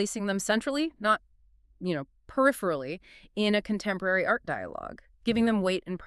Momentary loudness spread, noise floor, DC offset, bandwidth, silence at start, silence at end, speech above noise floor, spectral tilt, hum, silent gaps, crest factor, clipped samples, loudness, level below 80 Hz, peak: 13 LU; -61 dBFS; under 0.1%; 13.5 kHz; 0 s; 0 s; 33 dB; -4.5 dB/octave; none; none; 20 dB; under 0.1%; -29 LUFS; -58 dBFS; -10 dBFS